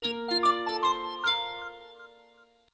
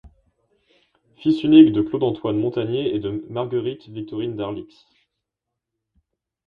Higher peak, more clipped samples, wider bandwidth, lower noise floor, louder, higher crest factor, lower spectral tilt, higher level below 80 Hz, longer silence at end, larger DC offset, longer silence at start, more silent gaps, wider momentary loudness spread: second, -14 dBFS vs 0 dBFS; neither; first, 8 kHz vs 4.9 kHz; second, -60 dBFS vs -83 dBFS; second, -27 LUFS vs -20 LUFS; second, 16 dB vs 22 dB; second, -2 dB/octave vs -9 dB/octave; second, -68 dBFS vs -56 dBFS; second, 0.65 s vs 1.8 s; neither; second, 0 s vs 1.2 s; neither; about the same, 18 LU vs 17 LU